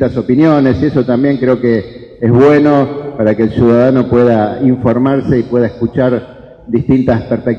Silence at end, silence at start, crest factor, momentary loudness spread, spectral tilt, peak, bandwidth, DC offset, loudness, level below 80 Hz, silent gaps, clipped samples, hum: 0 s; 0 s; 10 dB; 7 LU; -9.5 dB/octave; 0 dBFS; 6.4 kHz; 0.1%; -11 LUFS; -38 dBFS; none; under 0.1%; none